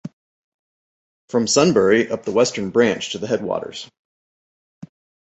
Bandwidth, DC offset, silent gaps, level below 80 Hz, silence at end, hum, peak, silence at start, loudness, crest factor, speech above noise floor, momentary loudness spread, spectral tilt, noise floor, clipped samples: 8.2 kHz; under 0.1%; 0.13-1.28 s; -58 dBFS; 1.45 s; none; -2 dBFS; 0.05 s; -19 LUFS; 20 dB; over 72 dB; 18 LU; -4 dB/octave; under -90 dBFS; under 0.1%